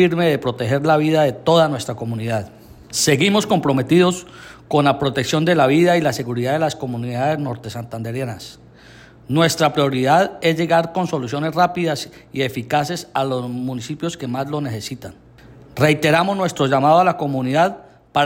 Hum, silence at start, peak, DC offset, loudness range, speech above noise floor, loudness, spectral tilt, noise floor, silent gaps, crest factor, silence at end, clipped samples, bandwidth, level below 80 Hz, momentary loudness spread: none; 0 s; -4 dBFS; under 0.1%; 6 LU; 26 dB; -18 LUFS; -5 dB/octave; -44 dBFS; none; 16 dB; 0 s; under 0.1%; 16.5 kHz; -54 dBFS; 12 LU